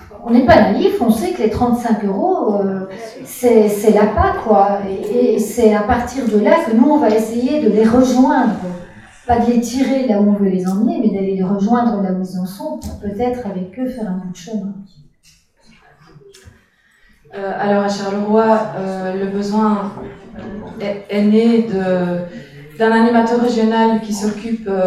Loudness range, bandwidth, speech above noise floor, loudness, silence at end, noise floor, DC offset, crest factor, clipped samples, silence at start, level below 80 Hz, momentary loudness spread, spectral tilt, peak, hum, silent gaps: 11 LU; 14 kHz; 38 dB; -15 LUFS; 0 s; -53 dBFS; under 0.1%; 16 dB; under 0.1%; 0 s; -40 dBFS; 14 LU; -6.5 dB/octave; 0 dBFS; none; none